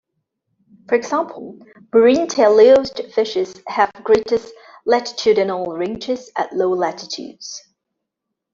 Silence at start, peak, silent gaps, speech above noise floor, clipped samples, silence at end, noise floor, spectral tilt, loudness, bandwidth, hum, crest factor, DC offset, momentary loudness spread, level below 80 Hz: 0.9 s; 0 dBFS; none; 63 dB; under 0.1%; 0.95 s; -80 dBFS; -4 dB/octave; -17 LUFS; 7.6 kHz; none; 18 dB; under 0.1%; 16 LU; -58 dBFS